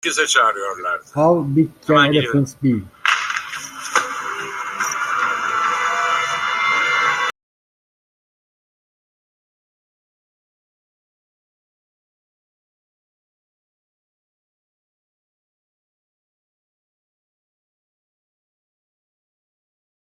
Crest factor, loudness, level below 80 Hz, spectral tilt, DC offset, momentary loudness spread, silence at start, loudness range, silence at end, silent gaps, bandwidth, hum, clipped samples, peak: 22 dB; -18 LUFS; -62 dBFS; -4 dB/octave; under 0.1%; 10 LU; 0.05 s; 5 LU; 12.7 s; none; 15.5 kHz; none; under 0.1%; -2 dBFS